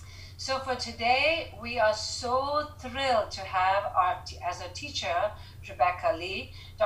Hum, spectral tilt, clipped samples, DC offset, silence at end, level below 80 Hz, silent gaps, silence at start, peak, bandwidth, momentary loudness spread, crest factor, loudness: none; -3 dB/octave; under 0.1%; under 0.1%; 0 s; -52 dBFS; none; 0 s; -12 dBFS; 15.5 kHz; 11 LU; 18 dB; -29 LUFS